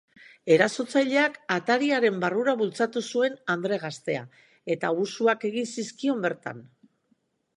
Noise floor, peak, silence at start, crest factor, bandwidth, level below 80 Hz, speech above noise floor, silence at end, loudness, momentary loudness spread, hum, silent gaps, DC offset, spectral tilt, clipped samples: -70 dBFS; -4 dBFS; 0.45 s; 22 dB; 11 kHz; -78 dBFS; 45 dB; 0.95 s; -26 LUFS; 11 LU; none; none; under 0.1%; -4.5 dB/octave; under 0.1%